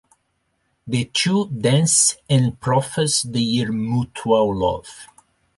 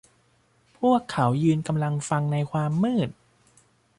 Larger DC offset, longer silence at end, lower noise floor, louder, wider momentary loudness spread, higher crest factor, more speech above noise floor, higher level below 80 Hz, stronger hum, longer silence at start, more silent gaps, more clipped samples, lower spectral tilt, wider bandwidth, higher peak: neither; second, 0.5 s vs 0.85 s; first, -70 dBFS vs -64 dBFS; first, -19 LUFS vs -25 LUFS; first, 8 LU vs 4 LU; about the same, 16 dB vs 16 dB; first, 50 dB vs 40 dB; first, -50 dBFS vs -60 dBFS; neither; about the same, 0.85 s vs 0.8 s; neither; neither; second, -4 dB/octave vs -7 dB/octave; about the same, 12 kHz vs 11.5 kHz; first, -4 dBFS vs -10 dBFS